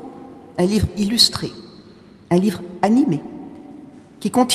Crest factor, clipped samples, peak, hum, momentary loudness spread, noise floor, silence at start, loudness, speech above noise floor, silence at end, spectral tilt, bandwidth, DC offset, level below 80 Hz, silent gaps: 20 dB; under 0.1%; 0 dBFS; none; 24 LU; -45 dBFS; 0 s; -18 LUFS; 27 dB; 0 s; -4.5 dB/octave; 15 kHz; under 0.1%; -42 dBFS; none